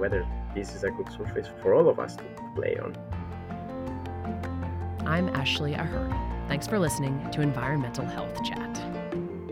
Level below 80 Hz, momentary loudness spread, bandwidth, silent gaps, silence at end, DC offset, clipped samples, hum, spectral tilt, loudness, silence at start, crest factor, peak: -42 dBFS; 11 LU; 16 kHz; none; 0 s; under 0.1%; under 0.1%; none; -6 dB/octave; -30 LUFS; 0 s; 20 dB; -10 dBFS